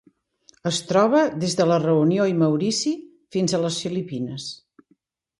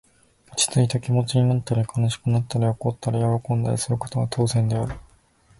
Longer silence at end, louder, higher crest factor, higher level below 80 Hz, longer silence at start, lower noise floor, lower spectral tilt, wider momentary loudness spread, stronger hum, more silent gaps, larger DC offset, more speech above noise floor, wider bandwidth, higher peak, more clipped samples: first, 0.85 s vs 0.55 s; about the same, -22 LUFS vs -23 LUFS; about the same, 18 dB vs 16 dB; second, -64 dBFS vs -48 dBFS; first, 0.65 s vs 0.5 s; first, -65 dBFS vs -57 dBFS; about the same, -5 dB/octave vs -5.5 dB/octave; first, 12 LU vs 6 LU; neither; neither; neither; first, 44 dB vs 35 dB; about the same, 11.5 kHz vs 11.5 kHz; about the same, -6 dBFS vs -8 dBFS; neither